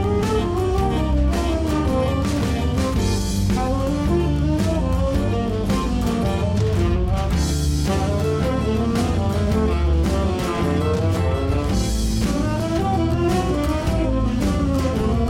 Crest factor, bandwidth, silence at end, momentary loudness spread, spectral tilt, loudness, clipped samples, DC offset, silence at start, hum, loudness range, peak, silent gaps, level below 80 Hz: 10 dB; 16.5 kHz; 0 s; 2 LU; -6.5 dB/octave; -21 LUFS; under 0.1%; under 0.1%; 0 s; none; 0 LU; -8 dBFS; none; -24 dBFS